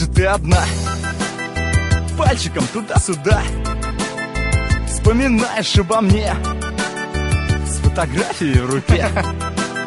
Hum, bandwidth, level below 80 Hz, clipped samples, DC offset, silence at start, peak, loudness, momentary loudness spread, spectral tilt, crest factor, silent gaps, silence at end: none; 11.5 kHz; -22 dBFS; under 0.1%; under 0.1%; 0 s; 0 dBFS; -18 LUFS; 7 LU; -5 dB/octave; 16 dB; none; 0 s